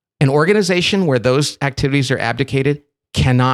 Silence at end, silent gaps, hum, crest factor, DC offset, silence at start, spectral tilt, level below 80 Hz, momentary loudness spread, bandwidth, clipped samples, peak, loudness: 0 s; none; none; 14 dB; under 0.1%; 0.2 s; -5.5 dB/octave; -40 dBFS; 6 LU; 13 kHz; under 0.1%; -2 dBFS; -16 LUFS